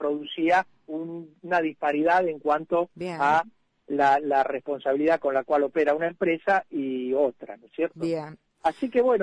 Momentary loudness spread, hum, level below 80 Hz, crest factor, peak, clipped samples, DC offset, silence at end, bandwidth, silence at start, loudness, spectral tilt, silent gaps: 12 LU; none; -66 dBFS; 14 dB; -10 dBFS; under 0.1%; under 0.1%; 0 s; 10 kHz; 0 s; -25 LUFS; -6 dB/octave; none